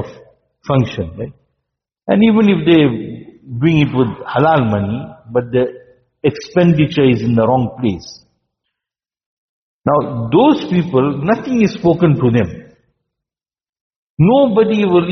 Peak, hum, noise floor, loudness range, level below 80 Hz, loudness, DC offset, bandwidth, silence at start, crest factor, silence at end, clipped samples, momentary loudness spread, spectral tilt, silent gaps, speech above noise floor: 0 dBFS; none; under -90 dBFS; 4 LU; -48 dBFS; -14 LUFS; under 0.1%; 6.4 kHz; 0 s; 14 dB; 0 s; under 0.1%; 14 LU; -6.5 dB/octave; 9.26-9.81 s, 13.69-13.73 s, 13.81-14.17 s; over 77 dB